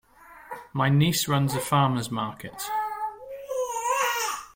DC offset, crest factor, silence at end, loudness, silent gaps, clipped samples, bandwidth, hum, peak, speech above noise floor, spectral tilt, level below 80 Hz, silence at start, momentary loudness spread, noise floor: under 0.1%; 18 dB; 0.05 s; -26 LUFS; none; under 0.1%; 17 kHz; none; -8 dBFS; 23 dB; -4.5 dB/octave; -60 dBFS; 0.2 s; 13 LU; -47 dBFS